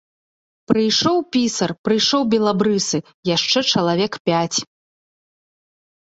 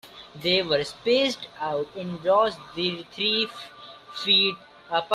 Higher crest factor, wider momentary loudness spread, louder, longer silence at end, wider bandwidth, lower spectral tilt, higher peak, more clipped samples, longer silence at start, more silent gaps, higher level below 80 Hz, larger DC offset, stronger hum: about the same, 18 dB vs 18 dB; second, 6 LU vs 19 LU; first, -18 LUFS vs -24 LUFS; first, 1.5 s vs 0 s; second, 8.2 kHz vs 14 kHz; about the same, -4 dB/octave vs -4 dB/octave; first, -2 dBFS vs -8 dBFS; neither; first, 0.7 s vs 0.05 s; first, 1.78-1.84 s, 3.14-3.23 s, 4.20-4.25 s vs none; first, -58 dBFS vs -64 dBFS; neither; neither